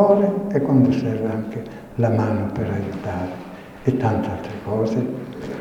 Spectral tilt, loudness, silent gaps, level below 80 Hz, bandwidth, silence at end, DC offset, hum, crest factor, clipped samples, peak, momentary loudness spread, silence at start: -9 dB/octave; -22 LUFS; none; -50 dBFS; 9.6 kHz; 0 s; under 0.1%; none; 18 dB; under 0.1%; -4 dBFS; 14 LU; 0 s